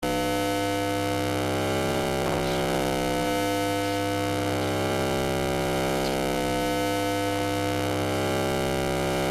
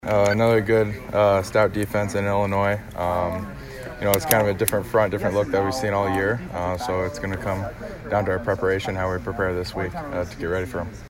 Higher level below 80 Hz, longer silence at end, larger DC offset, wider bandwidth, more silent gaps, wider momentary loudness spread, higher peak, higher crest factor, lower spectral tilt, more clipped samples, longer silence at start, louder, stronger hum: about the same, -46 dBFS vs -42 dBFS; about the same, 0 s vs 0 s; neither; about the same, 15.5 kHz vs 16 kHz; neither; second, 1 LU vs 10 LU; second, -12 dBFS vs 0 dBFS; second, 14 dB vs 22 dB; about the same, -4.5 dB/octave vs -5.5 dB/octave; neither; about the same, 0 s vs 0.05 s; second, -26 LUFS vs -23 LUFS; neither